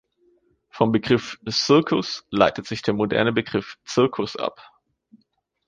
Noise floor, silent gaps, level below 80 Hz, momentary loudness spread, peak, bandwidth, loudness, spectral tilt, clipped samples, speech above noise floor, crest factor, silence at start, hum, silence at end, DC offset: -69 dBFS; none; -56 dBFS; 10 LU; -2 dBFS; 9.6 kHz; -22 LUFS; -5 dB/octave; under 0.1%; 47 dB; 22 dB; 0.75 s; none; 1.05 s; under 0.1%